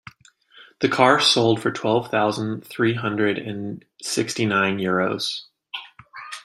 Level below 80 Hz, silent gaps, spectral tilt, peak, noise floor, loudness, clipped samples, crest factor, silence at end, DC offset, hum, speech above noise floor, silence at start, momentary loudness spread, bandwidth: -64 dBFS; none; -4 dB/octave; -2 dBFS; -53 dBFS; -21 LUFS; under 0.1%; 20 dB; 0.05 s; under 0.1%; none; 32 dB; 0.55 s; 18 LU; 16 kHz